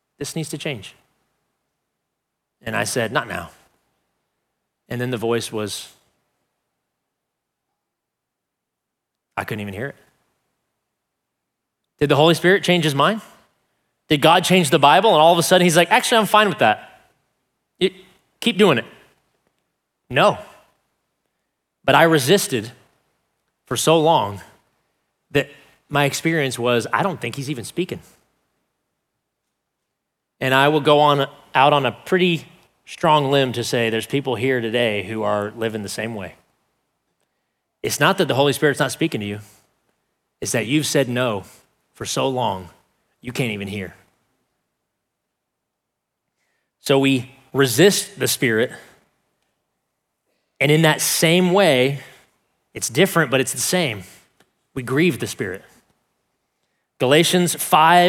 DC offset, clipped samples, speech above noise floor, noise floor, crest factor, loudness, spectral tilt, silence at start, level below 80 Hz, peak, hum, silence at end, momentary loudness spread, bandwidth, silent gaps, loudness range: under 0.1%; under 0.1%; 63 dB; -81 dBFS; 20 dB; -18 LUFS; -4 dB/octave; 0.2 s; -62 dBFS; 0 dBFS; none; 0 s; 16 LU; 17.5 kHz; none; 13 LU